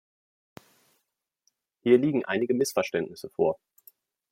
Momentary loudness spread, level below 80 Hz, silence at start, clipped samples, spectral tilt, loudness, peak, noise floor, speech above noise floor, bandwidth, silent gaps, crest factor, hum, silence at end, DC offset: 10 LU; -74 dBFS; 1.85 s; under 0.1%; -5.5 dB/octave; -26 LUFS; -8 dBFS; -80 dBFS; 55 dB; 16.5 kHz; none; 22 dB; none; 0.75 s; under 0.1%